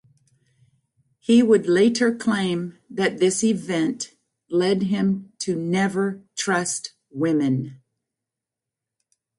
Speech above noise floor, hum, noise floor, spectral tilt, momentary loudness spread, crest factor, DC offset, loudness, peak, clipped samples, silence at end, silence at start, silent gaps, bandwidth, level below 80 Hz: 66 dB; none; -87 dBFS; -5 dB/octave; 11 LU; 16 dB; under 0.1%; -22 LUFS; -6 dBFS; under 0.1%; 1.65 s; 1.3 s; none; 11.5 kHz; -66 dBFS